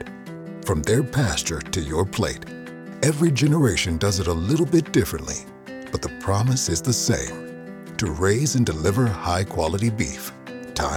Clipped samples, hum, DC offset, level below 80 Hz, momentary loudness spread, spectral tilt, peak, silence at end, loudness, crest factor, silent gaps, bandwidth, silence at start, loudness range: under 0.1%; none; under 0.1%; -40 dBFS; 16 LU; -5 dB/octave; -6 dBFS; 0 s; -22 LUFS; 18 dB; none; 17.5 kHz; 0 s; 3 LU